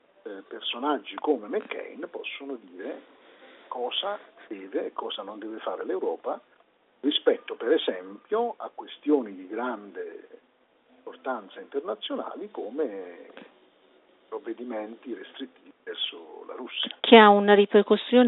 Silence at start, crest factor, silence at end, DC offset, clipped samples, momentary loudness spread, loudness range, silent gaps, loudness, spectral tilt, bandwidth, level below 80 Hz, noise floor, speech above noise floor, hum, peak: 0.25 s; 26 dB; 0 s; under 0.1%; under 0.1%; 20 LU; 14 LU; none; -26 LUFS; -2 dB/octave; 4.1 kHz; -80 dBFS; -64 dBFS; 38 dB; none; 0 dBFS